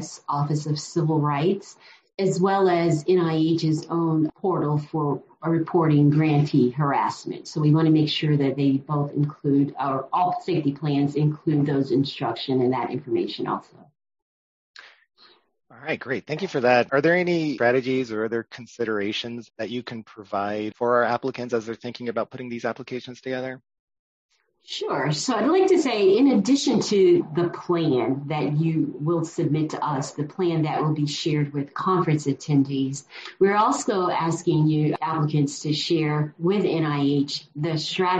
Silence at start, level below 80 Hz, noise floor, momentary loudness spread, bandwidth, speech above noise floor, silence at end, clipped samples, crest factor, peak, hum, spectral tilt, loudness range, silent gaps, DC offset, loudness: 0 s; -66 dBFS; under -90 dBFS; 11 LU; 8.8 kHz; over 67 dB; 0 s; under 0.1%; 18 dB; -6 dBFS; none; -6.5 dB/octave; 7 LU; 14.22-14.74 s, 23.79-23.88 s, 23.99-24.29 s; under 0.1%; -23 LUFS